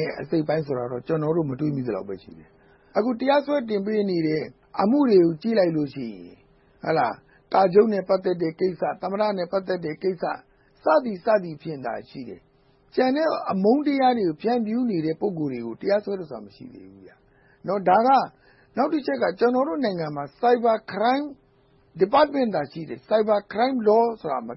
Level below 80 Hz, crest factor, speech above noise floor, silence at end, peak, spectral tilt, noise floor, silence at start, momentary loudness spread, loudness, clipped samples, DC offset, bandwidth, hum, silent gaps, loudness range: -64 dBFS; 18 dB; 36 dB; 0 s; -6 dBFS; -11 dB/octave; -59 dBFS; 0 s; 14 LU; -23 LUFS; under 0.1%; under 0.1%; 5.8 kHz; none; none; 4 LU